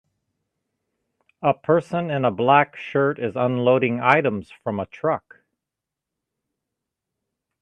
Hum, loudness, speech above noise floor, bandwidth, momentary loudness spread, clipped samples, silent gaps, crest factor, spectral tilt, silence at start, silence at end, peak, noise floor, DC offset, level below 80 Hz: none; -21 LUFS; 65 dB; 9.4 kHz; 11 LU; under 0.1%; none; 22 dB; -8 dB/octave; 1.4 s; 2.45 s; 0 dBFS; -86 dBFS; under 0.1%; -68 dBFS